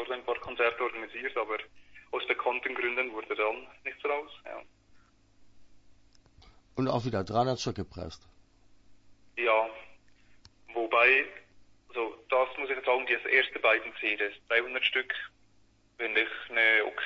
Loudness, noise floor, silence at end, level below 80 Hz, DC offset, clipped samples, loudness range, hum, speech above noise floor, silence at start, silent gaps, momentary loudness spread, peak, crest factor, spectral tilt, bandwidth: -29 LUFS; -64 dBFS; 0 s; -64 dBFS; under 0.1%; under 0.1%; 9 LU; none; 34 dB; 0 s; none; 17 LU; -10 dBFS; 22 dB; -4.5 dB/octave; 8 kHz